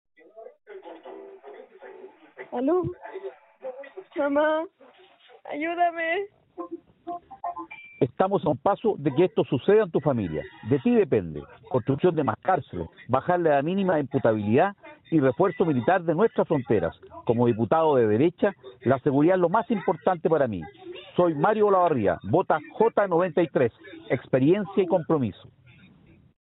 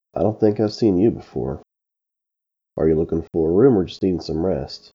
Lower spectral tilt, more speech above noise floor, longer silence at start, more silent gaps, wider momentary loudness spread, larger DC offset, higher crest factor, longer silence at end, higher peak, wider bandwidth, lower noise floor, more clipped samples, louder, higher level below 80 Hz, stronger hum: second, -6.5 dB/octave vs -8.5 dB/octave; second, 32 dB vs 65 dB; first, 0.35 s vs 0.15 s; neither; first, 18 LU vs 12 LU; neither; about the same, 20 dB vs 18 dB; first, 1.1 s vs 0.2 s; about the same, -6 dBFS vs -4 dBFS; second, 4.1 kHz vs 7.4 kHz; second, -55 dBFS vs -84 dBFS; neither; second, -24 LUFS vs -20 LUFS; second, -62 dBFS vs -44 dBFS; neither